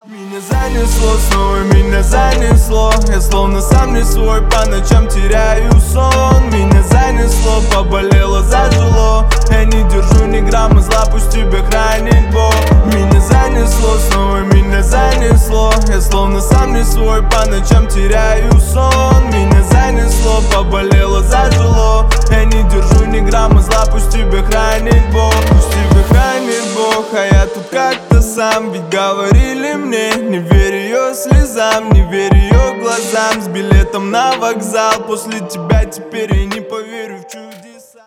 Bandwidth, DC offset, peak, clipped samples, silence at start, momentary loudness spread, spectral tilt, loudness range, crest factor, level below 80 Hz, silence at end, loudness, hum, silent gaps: 15.5 kHz; under 0.1%; 0 dBFS; under 0.1%; 0.1 s; 5 LU; -5.5 dB/octave; 2 LU; 8 dB; -12 dBFS; 0.5 s; -11 LUFS; none; none